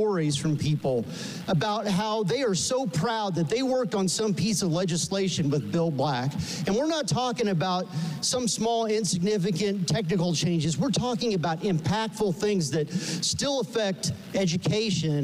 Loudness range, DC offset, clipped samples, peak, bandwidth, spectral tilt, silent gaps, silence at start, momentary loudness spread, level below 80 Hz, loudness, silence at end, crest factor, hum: 1 LU; under 0.1%; under 0.1%; -16 dBFS; 15.5 kHz; -5 dB/octave; none; 0 s; 3 LU; -56 dBFS; -26 LUFS; 0 s; 10 dB; none